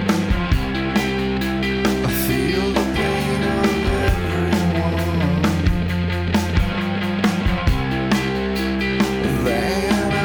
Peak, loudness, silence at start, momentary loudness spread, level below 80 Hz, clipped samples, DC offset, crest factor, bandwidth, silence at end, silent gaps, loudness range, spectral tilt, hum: -4 dBFS; -20 LUFS; 0 s; 3 LU; -28 dBFS; under 0.1%; under 0.1%; 16 dB; over 20 kHz; 0 s; none; 1 LU; -6 dB/octave; none